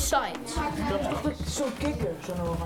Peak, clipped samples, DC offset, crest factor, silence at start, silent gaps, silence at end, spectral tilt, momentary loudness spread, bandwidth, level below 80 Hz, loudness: -12 dBFS; under 0.1%; under 0.1%; 18 dB; 0 s; none; 0 s; -4.5 dB/octave; 4 LU; 18.5 kHz; -40 dBFS; -30 LUFS